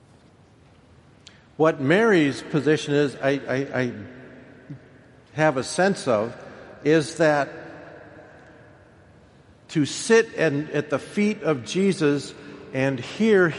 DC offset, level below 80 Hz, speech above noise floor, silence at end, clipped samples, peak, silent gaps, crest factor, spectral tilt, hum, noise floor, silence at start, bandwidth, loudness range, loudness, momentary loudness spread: under 0.1%; -62 dBFS; 32 dB; 0 s; under 0.1%; -4 dBFS; none; 20 dB; -5.5 dB/octave; none; -53 dBFS; 1.6 s; 11.5 kHz; 4 LU; -22 LUFS; 22 LU